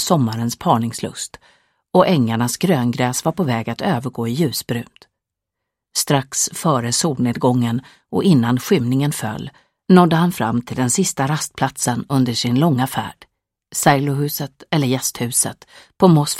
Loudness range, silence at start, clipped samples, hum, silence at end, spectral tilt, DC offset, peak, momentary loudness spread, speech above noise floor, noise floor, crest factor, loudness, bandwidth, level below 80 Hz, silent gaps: 4 LU; 0 s; under 0.1%; none; 0 s; -5 dB/octave; under 0.1%; 0 dBFS; 11 LU; 63 dB; -81 dBFS; 18 dB; -18 LUFS; 16.5 kHz; -56 dBFS; none